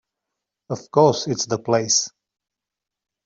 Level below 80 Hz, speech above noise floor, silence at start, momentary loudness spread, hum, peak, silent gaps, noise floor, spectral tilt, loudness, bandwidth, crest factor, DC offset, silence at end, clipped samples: -64 dBFS; 66 dB; 0.7 s; 15 LU; none; -4 dBFS; none; -86 dBFS; -3.5 dB/octave; -19 LUFS; 7.8 kHz; 20 dB; under 0.1%; 1.15 s; under 0.1%